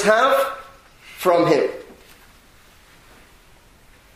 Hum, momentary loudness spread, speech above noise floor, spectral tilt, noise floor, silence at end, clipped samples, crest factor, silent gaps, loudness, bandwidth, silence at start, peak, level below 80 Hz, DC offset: none; 22 LU; 34 dB; -4.5 dB/octave; -50 dBFS; 2.35 s; under 0.1%; 20 dB; none; -18 LUFS; 15.5 kHz; 0 s; -2 dBFS; -56 dBFS; under 0.1%